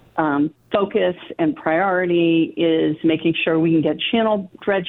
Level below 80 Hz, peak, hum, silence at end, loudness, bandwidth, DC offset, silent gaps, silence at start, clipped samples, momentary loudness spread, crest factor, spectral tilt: -58 dBFS; -4 dBFS; none; 0 s; -19 LUFS; 4.1 kHz; under 0.1%; none; 0.15 s; under 0.1%; 5 LU; 16 dB; -9.5 dB/octave